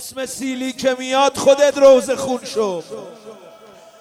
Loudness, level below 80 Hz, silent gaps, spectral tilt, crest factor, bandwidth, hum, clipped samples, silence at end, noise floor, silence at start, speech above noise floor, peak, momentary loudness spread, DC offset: -16 LUFS; -58 dBFS; none; -3 dB/octave; 18 dB; 14.5 kHz; none; under 0.1%; 0.55 s; -43 dBFS; 0 s; 27 dB; 0 dBFS; 17 LU; under 0.1%